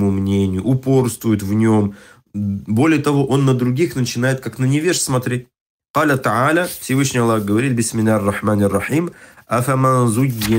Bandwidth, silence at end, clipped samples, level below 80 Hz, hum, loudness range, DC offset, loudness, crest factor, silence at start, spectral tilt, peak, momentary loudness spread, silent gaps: 16.5 kHz; 0 s; under 0.1%; -50 dBFS; none; 1 LU; under 0.1%; -17 LUFS; 12 dB; 0 s; -6 dB/octave; -4 dBFS; 6 LU; 5.61-5.80 s, 5.90-5.94 s